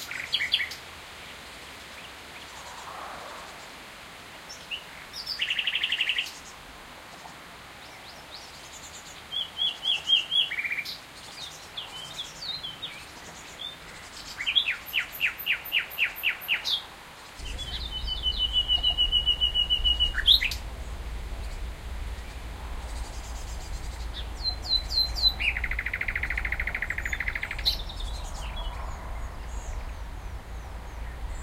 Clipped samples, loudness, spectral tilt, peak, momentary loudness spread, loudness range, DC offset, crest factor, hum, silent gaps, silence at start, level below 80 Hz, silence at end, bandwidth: under 0.1%; -27 LUFS; -1.5 dB/octave; -6 dBFS; 20 LU; 15 LU; under 0.1%; 24 dB; none; none; 0 s; -38 dBFS; 0 s; 16 kHz